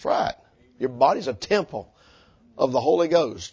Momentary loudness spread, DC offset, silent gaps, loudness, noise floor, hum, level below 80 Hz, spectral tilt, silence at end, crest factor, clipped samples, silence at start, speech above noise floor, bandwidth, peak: 12 LU; under 0.1%; none; -23 LUFS; -55 dBFS; none; -58 dBFS; -5 dB/octave; 0.05 s; 20 dB; under 0.1%; 0 s; 33 dB; 8 kHz; -4 dBFS